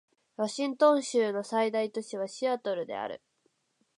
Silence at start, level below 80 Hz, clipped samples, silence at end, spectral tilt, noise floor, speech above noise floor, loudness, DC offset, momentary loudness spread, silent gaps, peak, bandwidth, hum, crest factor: 0.4 s; -84 dBFS; under 0.1%; 0.85 s; -4 dB/octave; -74 dBFS; 45 dB; -30 LUFS; under 0.1%; 13 LU; none; -10 dBFS; 11 kHz; none; 20 dB